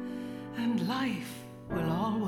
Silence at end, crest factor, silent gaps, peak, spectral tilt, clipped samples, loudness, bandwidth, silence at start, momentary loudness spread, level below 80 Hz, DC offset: 0 s; 12 dB; none; -20 dBFS; -6.5 dB/octave; under 0.1%; -33 LUFS; 17 kHz; 0 s; 10 LU; -58 dBFS; under 0.1%